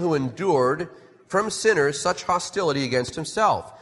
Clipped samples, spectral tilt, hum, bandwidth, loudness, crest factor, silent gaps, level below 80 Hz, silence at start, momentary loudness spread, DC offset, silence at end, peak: under 0.1%; -4 dB/octave; none; 11.5 kHz; -23 LUFS; 16 dB; none; -58 dBFS; 0 s; 6 LU; under 0.1%; 0.05 s; -6 dBFS